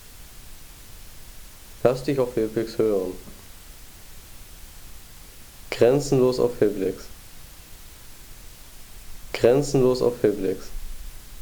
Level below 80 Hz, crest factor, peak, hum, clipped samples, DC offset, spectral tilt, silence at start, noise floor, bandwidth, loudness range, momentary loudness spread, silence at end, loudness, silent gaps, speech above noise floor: -42 dBFS; 20 dB; -6 dBFS; none; under 0.1%; under 0.1%; -6 dB/octave; 0 s; -43 dBFS; over 20 kHz; 5 LU; 24 LU; 0 s; -23 LUFS; none; 22 dB